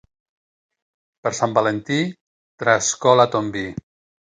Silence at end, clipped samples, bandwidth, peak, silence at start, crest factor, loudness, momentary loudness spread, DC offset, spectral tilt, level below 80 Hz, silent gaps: 0.5 s; under 0.1%; 9.8 kHz; 0 dBFS; 1.25 s; 22 dB; -20 LUFS; 13 LU; under 0.1%; -4 dB/octave; -58 dBFS; 2.21-2.58 s